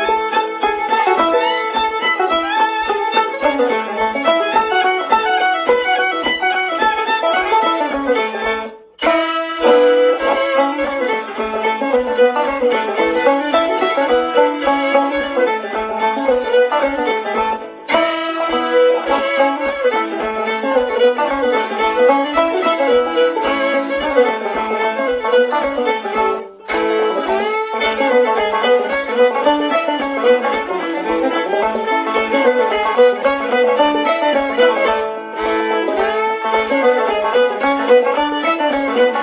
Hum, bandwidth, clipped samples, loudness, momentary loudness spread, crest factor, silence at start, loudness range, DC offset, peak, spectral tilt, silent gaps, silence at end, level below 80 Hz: none; 4 kHz; under 0.1%; -16 LUFS; 5 LU; 16 dB; 0 s; 2 LU; under 0.1%; 0 dBFS; -7 dB/octave; none; 0 s; -50 dBFS